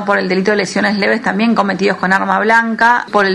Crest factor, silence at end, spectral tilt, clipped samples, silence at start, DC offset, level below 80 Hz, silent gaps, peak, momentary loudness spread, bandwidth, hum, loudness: 14 dB; 0 s; -5 dB/octave; under 0.1%; 0 s; under 0.1%; -56 dBFS; none; 0 dBFS; 3 LU; 12 kHz; none; -13 LUFS